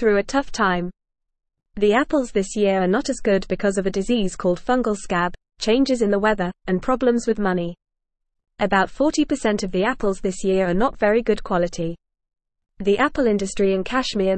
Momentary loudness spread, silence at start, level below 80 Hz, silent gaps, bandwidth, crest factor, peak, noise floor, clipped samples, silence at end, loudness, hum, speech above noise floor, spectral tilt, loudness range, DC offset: 6 LU; 0 s; -42 dBFS; none; 8.8 kHz; 16 dB; -6 dBFS; -77 dBFS; under 0.1%; 0 s; -21 LUFS; none; 57 dB; -5.5 dB/octave; 1 LU; 0.4%